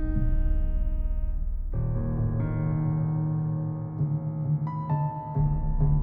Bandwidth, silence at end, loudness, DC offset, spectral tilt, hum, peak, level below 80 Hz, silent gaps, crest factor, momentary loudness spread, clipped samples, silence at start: 2.3 kHz; 0 s; -29 LUFS; under 0.1%; -13 dB/octave; none; -12 dBFS; -28 dBFS; none; 14 dB; 5 LU; under 0.1%; 0 s